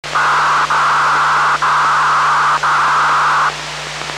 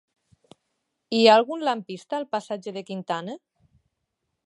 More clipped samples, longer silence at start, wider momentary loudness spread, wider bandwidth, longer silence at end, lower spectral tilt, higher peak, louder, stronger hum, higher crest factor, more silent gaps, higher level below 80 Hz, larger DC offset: neither; second, 0.05 s vs 1.1 s; second, 4 LU vs 17 LU; first, 14.5 kHz vs 11 kHz; second, 0 s vs 1.1 s; second, -1.5 dB/octave vs -4.5 dB/octave; about the same, -4 dBFS vs -4 dBFS; first, -12 LUFS vs -24 LUFS; neither; second, 10 dB vs 22 dB; neither; first, -46 dBFS vs -78 dBFS; neither